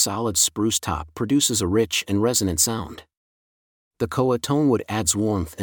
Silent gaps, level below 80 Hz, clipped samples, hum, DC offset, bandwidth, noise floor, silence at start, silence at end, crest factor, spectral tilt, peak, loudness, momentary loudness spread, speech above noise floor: 3.17-3.91 s; -48 dBFS; under 0.1%; none; under 0.1%; 19 kHz; under -90 dBFS; 0 s; 0 s; 18 dB; -3.5 dB/octave; -6 dBFS; -21 LUFS; 8 LU; over 68 dB